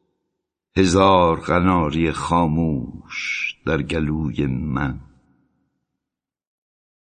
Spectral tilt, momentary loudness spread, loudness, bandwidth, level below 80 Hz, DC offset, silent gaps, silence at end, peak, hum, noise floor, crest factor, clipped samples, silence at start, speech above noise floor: -6 dB/octave; 12 LU; -20 LUFS; 9.6 kHz; -36 dBFS; under 0.1%; none; 2.05 s; -2 dBFS; none; -86 dBFS; 20 dB; under 0.1%; 0.75 s; 67 dB